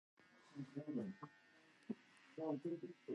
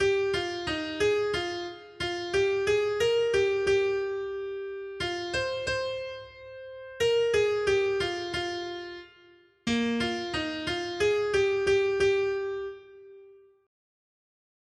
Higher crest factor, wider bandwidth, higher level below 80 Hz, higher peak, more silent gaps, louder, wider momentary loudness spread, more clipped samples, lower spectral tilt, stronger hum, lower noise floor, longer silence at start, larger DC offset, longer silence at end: about the same, 18 dB vs 14 dB; about the same, 11 kHz vs 11.5 kHz; second, under -90 dBFS vs -56 dBFS; second, -34 dBFS vs -14 dBFS; neither; second, -50 LUFS vs -28 LUFS; first, 21 LU vs 14 LU; neither; first, -8 dB/octave vs -4 dB/octave; neither; first, -70 dBFS vs -58 dBFS; first, 0.2 s vs 0 s; neither; second, 0 s vs 1.35 s